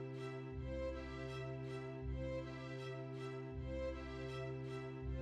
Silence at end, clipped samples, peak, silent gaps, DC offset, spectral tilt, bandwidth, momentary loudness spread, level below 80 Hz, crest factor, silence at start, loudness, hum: 0 s; under 0.1%; -34 dBFS; none; under 0.1%; -7.5 dB/octave; 9.2 kHz; 3 LU; -54 dBFS; 12 dB; 0 s; -47 LUFS; none